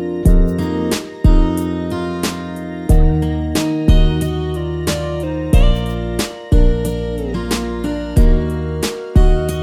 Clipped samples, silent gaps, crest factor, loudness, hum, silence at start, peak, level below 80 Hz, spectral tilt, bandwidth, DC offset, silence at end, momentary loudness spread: under 0.1%; none; 14 dB; -18 LUFS; none; 0 s; 0 dBFS; -16 dBFS; -6.5 dB/octave; 15 kHz; under 0.1%; 0 s; 7 LU